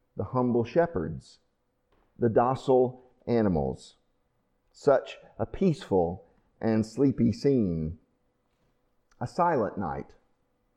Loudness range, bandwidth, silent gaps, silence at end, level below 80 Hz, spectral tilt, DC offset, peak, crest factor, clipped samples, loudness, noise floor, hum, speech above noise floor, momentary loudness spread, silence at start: 2 LU; 10 kHz; none; 0.75 s; -52 dBFS; -8 dB/octave; under 0.1%; -10 dBFS; 18 dB; under 0.1%; -27 LUFS; -72 dBFS; none; 46 dB; 14 LU; 0.15 s